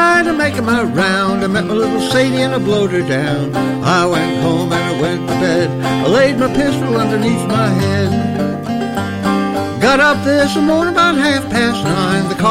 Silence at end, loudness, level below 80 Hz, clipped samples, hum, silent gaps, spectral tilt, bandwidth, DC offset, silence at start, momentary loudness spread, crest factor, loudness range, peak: 0 s; -14 LUFS; -42 dBFS; under 0.1%; none; none; -5.5 dB/octave; 16 kHz; under 0.1%; 0 s; 5 LU; 12 dB; 2 LU; -2 dBFS